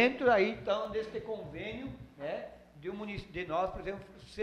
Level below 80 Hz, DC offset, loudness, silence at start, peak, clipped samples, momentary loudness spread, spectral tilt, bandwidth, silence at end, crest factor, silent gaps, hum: -56 dBFS; under 0.1%; -35 LUFS; 0 s; -14 dBFS; under 0.1%; 18 LU; -6 dB/octave; 10.5 kHz; 0 s; 20 dB; none; none